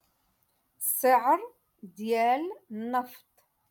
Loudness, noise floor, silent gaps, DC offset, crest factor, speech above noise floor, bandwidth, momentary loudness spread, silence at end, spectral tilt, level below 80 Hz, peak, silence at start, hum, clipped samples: -27 LUFS; -73 dBFS; none; under 0.1%; 18 dB; 45 dB; 17.5 kHz; 16 LU; 0.55 s; -3 dB/octave; -82 dBFS; -12 dBFS; 0.8 s; none; under 0.1%